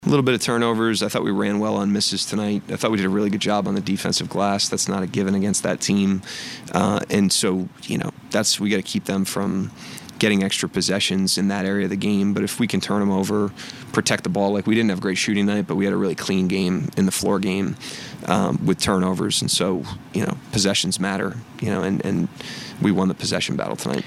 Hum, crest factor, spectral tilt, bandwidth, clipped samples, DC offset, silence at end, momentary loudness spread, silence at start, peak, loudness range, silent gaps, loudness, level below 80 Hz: none; 20 dB; -4.5 dB/octave; 15 kHz; under 0.1%; under 0.1%; 0 s; 7 LU; 0 s; 0 dBFS; 1 LU; none; -21 LUFS; -54 dBFS